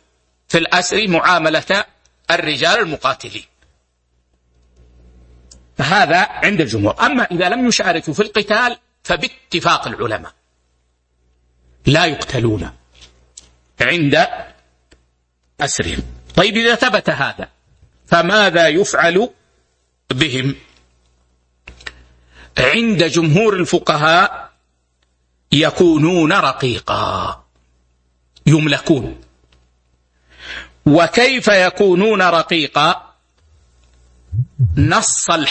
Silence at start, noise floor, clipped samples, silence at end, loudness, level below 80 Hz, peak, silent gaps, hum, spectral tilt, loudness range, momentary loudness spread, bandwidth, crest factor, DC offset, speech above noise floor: 0.5 s; -63 dBFS; under 0.1%; 0 s; -15 LUFS; -42 dBFS; 0 dBFS; none; none; -4 dB/octave; 6 LU; 14 LU; 8.8 kHz; 16 dB; under 0.1%; 49 dB